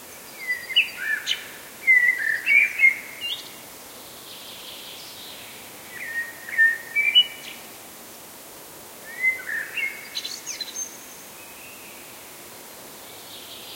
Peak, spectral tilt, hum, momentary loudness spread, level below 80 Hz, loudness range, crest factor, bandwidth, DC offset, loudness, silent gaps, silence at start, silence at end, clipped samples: -6 dBFS; 1 dB/octave; none; 23 LU; -70 dBFS; 15 LU; 20 dB; 16.5 kHz; under 0.1%; -21 LUFS; none; 0 s; 0 s; under 0.1%